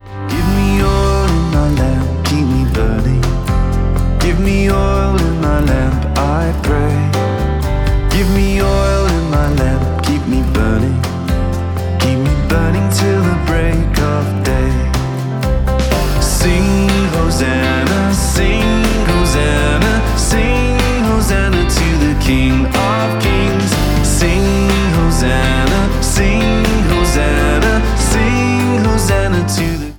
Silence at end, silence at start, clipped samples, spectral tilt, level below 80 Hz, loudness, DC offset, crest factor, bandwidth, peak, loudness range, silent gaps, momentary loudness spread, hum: 0 s; 0.05 s; under 0.1%; -5.5 dB/octave; -16 dBFS; -14 LUFS; under 0.1%; 12 dB; 19.5 kHz; 0 dBFS; 2 LU; none; 3 LU; none